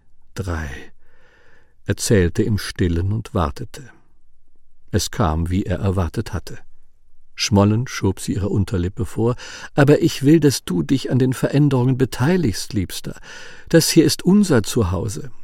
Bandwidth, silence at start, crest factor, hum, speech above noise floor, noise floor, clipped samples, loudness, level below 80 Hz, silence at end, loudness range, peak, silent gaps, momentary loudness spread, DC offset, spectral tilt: 16.5 kHz; 0.1 s; 18 dB; none; 26 dB; -44 dBFS; under 0.1%; -19 LUFS; -38 dBFS; 0 s; 6 LU; -2 dBFS; none; 16 LU; under 0.1%; -5.5 dB/octave